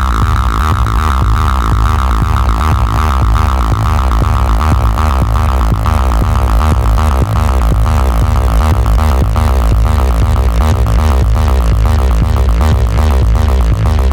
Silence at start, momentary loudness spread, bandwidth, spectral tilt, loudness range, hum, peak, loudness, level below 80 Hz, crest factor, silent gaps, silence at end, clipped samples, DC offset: 0 s; 1 LU; 17 kHz; -6.5 dB/octave; 1 LU; none; -2 dBFS; -12 LUFS; -10 dBFS; 8 dB; none; 0 s; under 0.1%; 0.4%